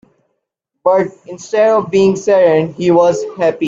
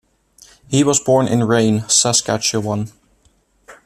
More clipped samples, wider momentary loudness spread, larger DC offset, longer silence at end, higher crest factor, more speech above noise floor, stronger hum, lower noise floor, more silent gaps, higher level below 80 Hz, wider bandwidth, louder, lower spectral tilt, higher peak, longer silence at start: neither; about the same, 8 LU vs 10 LU; neither; second, 0 s vs 0.15 s; about the same, 14 dB vs 16 dB; first, 61 dB vs 42 dB; neither; first, -74 dBFS vs -58 dBFS; neither; about the same, -56 dBFS vs -54 dBFS; second, 7.8 kHz vs 14.5 kHz; about the same, -13 LUFS vs -15 LUFS; first, -6 dB/octave vs -4 dB/octave; about the same, 0 dBFS vs -2 dBFS; first, 0.85 s vs 0.7 s